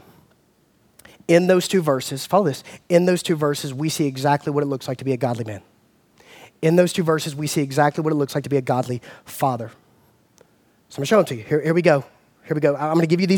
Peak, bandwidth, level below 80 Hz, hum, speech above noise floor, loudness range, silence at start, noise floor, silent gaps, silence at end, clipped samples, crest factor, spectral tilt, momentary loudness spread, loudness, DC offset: -2 dBFS; 19 kHz; -66 dBFS; none; 40 dB; 4 LU; 1.3 s; -60 dBFS; none; 0 s; under 0.1%; 20 dB; -6 dB/octave; 12 LU; -21 LUFS; under 0.1%